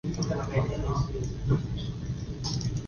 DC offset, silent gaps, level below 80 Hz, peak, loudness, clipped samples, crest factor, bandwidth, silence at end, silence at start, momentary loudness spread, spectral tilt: under 0.1%; none; -38 dBFS; -12 dBFS; -31 LUFS; under 0.1%; 18 dB; 7 kHz; 0 s; 0.05 s; 6 LU; -6.5 dB/octave